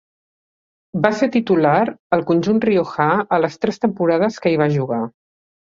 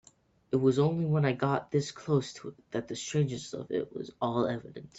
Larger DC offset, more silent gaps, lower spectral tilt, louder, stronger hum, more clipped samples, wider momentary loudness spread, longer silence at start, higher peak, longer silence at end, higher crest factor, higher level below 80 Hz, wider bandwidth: neither; first, 1.99-2.10 s vs none; about the same, -7.5 dB/octave vs -6.5 dB/octave; first, -18 LUFS vs -31 LUFS; neither; neither; second, 5 LU vs 11 LU; first, 0.95 s vs 0.5 s; first, -2 dBFS vs -12 dBFS; first, 0.7 s vs 0 s; about the same, 16 dB vs 18 dB; first, -58 dBFS vs -66 dBFS; about the same, 7.6 kHz vs 8 kHz